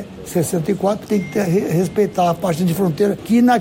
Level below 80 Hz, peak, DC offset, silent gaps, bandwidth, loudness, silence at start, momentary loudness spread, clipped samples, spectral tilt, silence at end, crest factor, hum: -50 dBFS; -6 dBFS; under 0.1%; none; 16.5 kHz; -18 LUFS; 0 s; 4 LU; under 0.1%; -6.5 dB/octave; 0 s; 12 dB; none